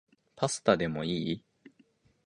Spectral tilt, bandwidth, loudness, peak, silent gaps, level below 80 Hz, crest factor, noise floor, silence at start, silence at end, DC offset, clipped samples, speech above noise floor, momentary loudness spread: -4.5 dB/octave; 11.5 kHz; -31 LUFS; -8 dBFS; none; -62 dBFS; 24 dB; -66 dBFS; 0.35 s; 0.85 s; under 0.1%; under 0.1%; 37 dB; 9 LU